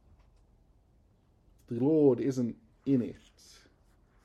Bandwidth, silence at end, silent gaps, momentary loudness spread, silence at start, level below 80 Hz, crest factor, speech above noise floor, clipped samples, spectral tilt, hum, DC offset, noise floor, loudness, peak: 10 kHz; 1.1 s; none; 15 LU; 1.7 s; -64 dBFS; 18 dB; 37 dB; under 0.1%; -8.5 dB/octave; none; under 0.1%; -66 dBFS; -30 LUFS; -14 dBFS